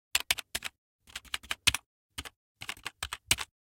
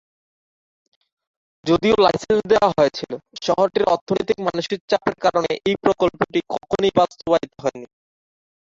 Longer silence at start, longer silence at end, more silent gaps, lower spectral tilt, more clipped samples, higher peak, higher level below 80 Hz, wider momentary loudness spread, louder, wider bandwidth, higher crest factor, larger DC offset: second, 0.15 s vs 1.65 s; second, 0.2 s vs 0.8 s; first, 0.78-0.99 s, 1.86-2.09 s, 2.36-2.55 s vs 4.01-4.07 s, 4.81-4.88 s; second, 0 dB/octave vs -5.5 dB/octave; neither; about the same, -4 dBFS vs -2 dBFS; about the same, -54 dBFS vs -52 dBFS; first, 17 LU vs 10 LU; second, -32 LUFS vs -20 LUFS; first, 17 kHz vs 7.8 kHz; first, 32 dB vs 20 dB; neither